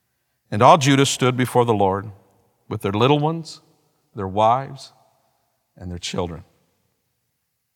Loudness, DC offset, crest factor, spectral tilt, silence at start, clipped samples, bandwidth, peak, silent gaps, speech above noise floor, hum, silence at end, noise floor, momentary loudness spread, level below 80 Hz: -19 LUFS; under 0.1%; 22 dB; -5 dB/octave; 0.5 s; under 0.1%; 17 kHz; 0 dBFS; none; 55 dB; none; 1.35 s; -74 dBFS; 24 LU; -56 dBFS